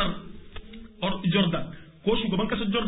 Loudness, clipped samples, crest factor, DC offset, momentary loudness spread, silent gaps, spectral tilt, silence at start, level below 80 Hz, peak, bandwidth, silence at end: -27 LUFS; under 0.1%; 18 dB; 0.2%; 21 LU; none; -10.5 dB/octave; 0 s; -46 dBFS; -10 dBFS; 4 kHz; 0 s